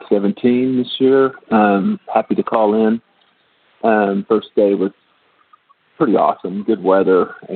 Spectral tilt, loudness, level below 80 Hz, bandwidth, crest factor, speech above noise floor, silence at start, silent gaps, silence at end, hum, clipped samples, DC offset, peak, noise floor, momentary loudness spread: -10.5 dB/octave; -16 LUFS; -64 dBFS; 4.5 kHz; 14 dB; 42 dB; 0 s; none; 0 s; none; under 0.1%; under 0.1%; -2 dBFS; -57 dBFS; 7 LU